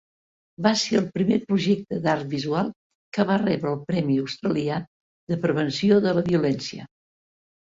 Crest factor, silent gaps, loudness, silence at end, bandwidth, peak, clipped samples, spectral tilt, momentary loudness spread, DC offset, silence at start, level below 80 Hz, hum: 18 dB; 2.76-3.12 s, 4.88-5.27 s; -24 LUFS; 0.85 s; 7.8 kHz; -6 dBFS; under 0.1%; -6 dB/octave; 10 LU; under 0.1%; 0.6 s; -60 dBFS; none